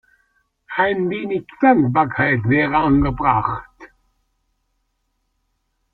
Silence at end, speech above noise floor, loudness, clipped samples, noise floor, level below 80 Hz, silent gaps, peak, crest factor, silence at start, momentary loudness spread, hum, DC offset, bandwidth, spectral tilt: 2.05 s; 53 dB; -18 LUFS; under 0.1%; -70 dBFS; -40 dBFS; none; -2 dBFS; 18 dB; 0.7 s; 10 LU; none; under 0.1%; 4.5 kHz; -10 dB/octave